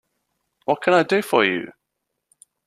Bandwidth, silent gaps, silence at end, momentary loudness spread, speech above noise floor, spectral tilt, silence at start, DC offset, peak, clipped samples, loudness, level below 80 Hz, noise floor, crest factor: 14.5 kHz; none; 0.95 s; 14 LU; 60 dB; -5 dB/octave; 0.7 s; under 0.1%; -2 dBFS; under 0.1%; -19 LUFS; -70 dBFS; -79 dBFS; 22 dB